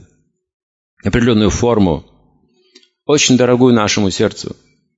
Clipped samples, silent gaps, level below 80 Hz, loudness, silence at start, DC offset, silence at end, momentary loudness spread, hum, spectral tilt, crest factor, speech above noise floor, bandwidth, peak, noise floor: under 0.1%; none; -36 dBFS; -13 LUFS; 1.05 s; under 0.1%; 0.45 s; 14 LU; none; -4.5 dB/octave; 14 dB; 44 dB; 8 kHz; 0 dBFS; -57 dBFS